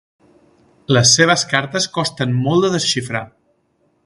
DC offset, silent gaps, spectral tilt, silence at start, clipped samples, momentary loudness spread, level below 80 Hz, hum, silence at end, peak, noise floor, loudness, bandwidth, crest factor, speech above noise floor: under 0.1%; none; -3.5 dB/octave; 0.9 s; under 0.1%; 10 LU; -54 dBFS; none; 0.8 s; 0 dBFS; -62 dBFS; -15 LUFS; 11.5 kHz; 18 dB; 46 dB